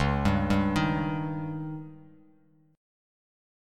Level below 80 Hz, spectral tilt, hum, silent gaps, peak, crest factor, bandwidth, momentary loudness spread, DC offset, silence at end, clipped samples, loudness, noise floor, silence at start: -42 dBFS; -7 dB/octave; none; none; -10 dBFS; 20 dB; 12.5 kHz; 14 LU; under 0.1%; 0.95 s; under 0.1%; -28 LUFS; -62 dBFS; 0 s